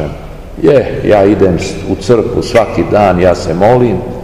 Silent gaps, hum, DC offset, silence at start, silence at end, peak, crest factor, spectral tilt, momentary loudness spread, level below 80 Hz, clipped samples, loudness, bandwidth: none; none; 1%; 0 s; 0 s; 0 dBFS; 10 dB; -7 dB/octave; 9 LU; -28 dBFS; 3%; -10 LUFS; 15 kHz